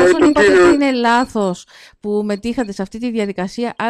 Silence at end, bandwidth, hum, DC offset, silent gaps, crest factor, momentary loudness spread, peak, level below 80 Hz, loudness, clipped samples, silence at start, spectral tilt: 0 s; 11 kHz; none; under 0.1%; none; 12 dB; 13 LU; -4 dBFS; -44 dBFS; -15 LUFS; under 0.1%; 0 s; -5 dB/octave